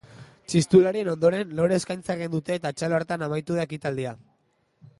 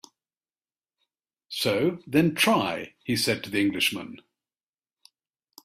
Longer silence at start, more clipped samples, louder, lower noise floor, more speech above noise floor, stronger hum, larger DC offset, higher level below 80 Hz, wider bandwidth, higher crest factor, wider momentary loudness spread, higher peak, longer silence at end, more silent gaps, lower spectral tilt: second, 0.15 s vs 1.5 s; neither; about the same, -25 LUFS vs -25 LUFS; second, -69 dBFS vs under -90 dBFS; second, 45 dB vs over 65 dB; neither; neither; about the same, -60 dBFS vs -64 dBFS; second, 11.5 kHz vs 16 kHz; about the same, 18 dB vs 22 dB; about the same, 11 LU vs 13 LU; about the same, -6 dBFS vs -6 dBFS; second, 0.85 s vs 1.45 s; neither; first, -6 dB/octave vs -4 dB/octave